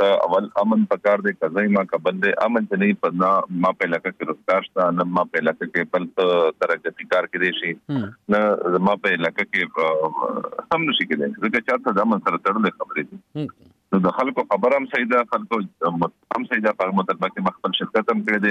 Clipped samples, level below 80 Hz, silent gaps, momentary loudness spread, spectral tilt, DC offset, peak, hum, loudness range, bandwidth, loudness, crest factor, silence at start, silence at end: under 0.1%; -66 dBFS; none; 7 LU; -7 dB/octave; under 0.1%; -6 dBFS; none; 2 LU; 8.2 kHz; -21 LUFS; 16 dB; 0 s; 0 s